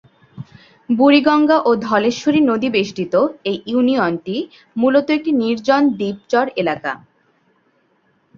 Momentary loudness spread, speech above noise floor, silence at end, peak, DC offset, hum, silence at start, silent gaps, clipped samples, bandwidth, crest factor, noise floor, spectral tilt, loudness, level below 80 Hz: 13 LU; 45 dB; 1.4 s; -2 dBFS; under 0.1%; none; 0.35 s; none; under 0.1%; 7.2 kHz; 16 dB; -61 dBFS; -5.5 dB/octave; -16 LUFS; -60 dBFS